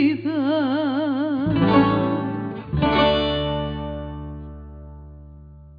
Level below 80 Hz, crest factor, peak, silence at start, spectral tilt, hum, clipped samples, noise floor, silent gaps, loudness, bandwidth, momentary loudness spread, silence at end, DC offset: -38 dBFS; 18 dB; -4 dBFS; 0 s; -9 dB/octave; none; under 0.1%; -43 dBFS; none; -21 LUFS; 5.2 kHz; 21 LU; 0 s; under 0.1%